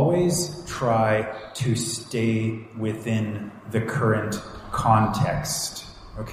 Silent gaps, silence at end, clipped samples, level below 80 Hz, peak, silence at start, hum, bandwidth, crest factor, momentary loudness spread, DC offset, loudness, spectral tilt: none; 0 s; under 0.1%; -46 dBFS; -4 dBFS; 0 s; none; 15.5 kHz; 20 dB; 11 LU; under 0.1%; -25 LUFS; -5 dB/octave